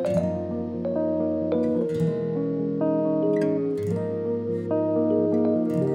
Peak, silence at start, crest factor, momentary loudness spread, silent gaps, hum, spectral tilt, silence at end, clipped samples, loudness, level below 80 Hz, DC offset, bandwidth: -12 dBFS; 0 s; 12 dB; 5 LU; none; none; -9.5 dB/octave; 0 s; under 0.1%; -25 LUFS; -64 dBFS; under 0.1%; 10.5 kHz